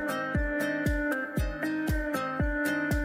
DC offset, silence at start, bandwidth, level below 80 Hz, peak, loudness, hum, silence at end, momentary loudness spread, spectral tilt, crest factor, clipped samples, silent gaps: under 0.1%; 0 s; 16 kHz; -36 dBFS; -16 dBFS; -30 LUFS; none; 0 s; 3 LU; -6 dB/octave; 12 dB; under 0.1%; none